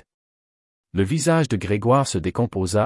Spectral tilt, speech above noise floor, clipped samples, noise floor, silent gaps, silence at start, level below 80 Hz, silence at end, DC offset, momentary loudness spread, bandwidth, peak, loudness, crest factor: -6 dB/octave; over 70 dB; under 0.1%; under -90 dBFS; none; 0.95 s; -52 dBFS; 0 s; under 0.1%; 5 LU; 12 kHz; -6 dBFS; -21 LUFS; 16 dB